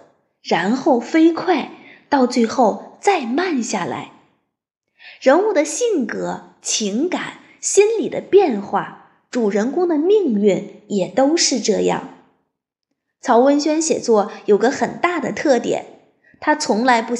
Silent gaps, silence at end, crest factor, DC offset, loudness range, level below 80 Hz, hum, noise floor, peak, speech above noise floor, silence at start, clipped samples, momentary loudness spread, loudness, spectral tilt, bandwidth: none; 0 s; 18 dB; under 0.1%; 3 LU; -68 dBFS; none; -77 dBFS; -2 dBFS; 60 dB; 0.45 s; under 0.1%; 10 LU; -18 LUFS; -4 dB/octave; 11.5 kHz